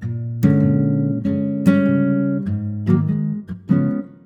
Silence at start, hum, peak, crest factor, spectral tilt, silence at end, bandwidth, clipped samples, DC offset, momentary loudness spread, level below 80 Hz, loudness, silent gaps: 0 s; none; -4 dBFS; 14 dB; -10 dB/octave; 0.15 s; 14 kHz; under 0.1%; under 0.1%; 7 LU; -52 dBFS; -19 LUFS; none